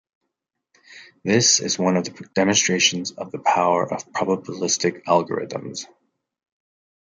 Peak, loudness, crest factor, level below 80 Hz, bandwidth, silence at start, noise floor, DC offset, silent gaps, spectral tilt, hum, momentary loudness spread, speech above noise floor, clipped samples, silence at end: -2 dBFS; -20 LUFS; 20 dB; -68 dBFS; 10.5 kHz; 0.9 s; -80 dBFS; under 0.1%; none; -3 dB/octave; none; 14 LU; 59 dB; under 0.1%; 1.25 s